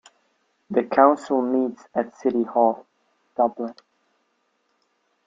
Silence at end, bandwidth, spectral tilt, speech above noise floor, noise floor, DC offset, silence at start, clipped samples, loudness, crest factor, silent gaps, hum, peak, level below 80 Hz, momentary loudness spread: 1.55 s; 7.6 kHz; -7 dB/octave; 49 dB; -70 dBFS; under 0.1%; 0.7 s; under 0.1%; -22 LUFS; 22 dB; none; none; -4 dBFS; -72 dBFS; 16 LU